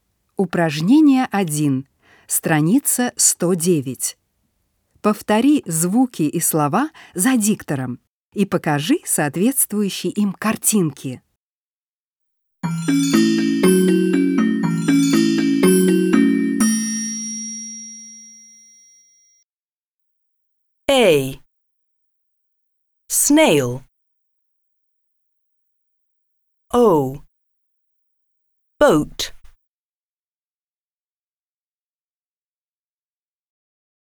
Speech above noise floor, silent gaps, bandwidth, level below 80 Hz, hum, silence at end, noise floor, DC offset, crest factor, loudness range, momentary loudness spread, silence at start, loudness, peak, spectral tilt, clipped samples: over 73 dB; 8.09-8.32 s, 11.37-12.16 s, 19.43-19.99 s; over 20 kHz; -54 dBFS; none; 4.7 s; under -90 dBFS; under 0.1%; 18 dB; 7 LU; 13 LU; 0.4 s; -17 LUFS; -2 dBFS; -4.5 dB/octave; under 0.1%